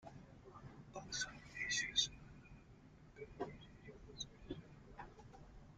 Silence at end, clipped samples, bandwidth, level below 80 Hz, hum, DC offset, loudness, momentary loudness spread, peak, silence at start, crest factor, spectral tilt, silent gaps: 0 s; under 0.1%; 12.5 kHz; -64 dBFS; none; under 0.1%; -43 LUFS; 23 LU; -24 dBFS; 0 s; 26 dB; -1.5 dB/octave; none